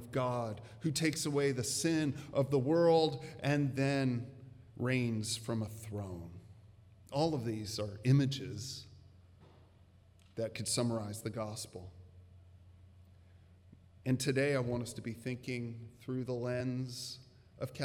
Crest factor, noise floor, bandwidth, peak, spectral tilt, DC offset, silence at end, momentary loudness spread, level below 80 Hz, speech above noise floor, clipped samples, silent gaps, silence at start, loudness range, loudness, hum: 18 dB; -62 dBFS; 17 kHz; -18 dBFS; -5.5 dB/octave; under 0.1%; 0 s; 15 LU; -68 dBFS; 28 dB; under 0.1%; none; 0 s; 8 LU; -35 LUFS; none